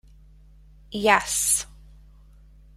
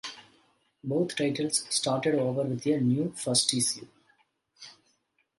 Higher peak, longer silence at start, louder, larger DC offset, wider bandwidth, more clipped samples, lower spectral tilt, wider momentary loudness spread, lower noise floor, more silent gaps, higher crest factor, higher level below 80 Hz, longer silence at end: first, -2 dBFS vs -8 dBFS; first, 0.9 s vs 0.05 s; first, -21 LUFS vs -27 LUFS; neither; first, 16 kHz vs 12 kHz; neither; second, -1.5 dB/octave vs -4 dB/octave; second, 16 LU vs 19 LU; second, -51 dBFS vs -73 dBFS; neither; about the same, 26 dB vs 22 dB; first, -50 dBFS vs -72 dBFS; first, 1.1 s vs 0.65 s